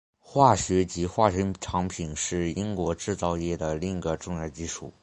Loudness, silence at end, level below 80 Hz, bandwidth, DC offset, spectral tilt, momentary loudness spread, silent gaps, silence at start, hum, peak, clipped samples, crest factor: -27 LUFS; 0.1 s; -44 dBFS; 11 kHz; under 0.1%; -5.5 dB/octave; 11 LU; none; 0.3 s; none; -4 dBFS; under 0.1%; 22 dB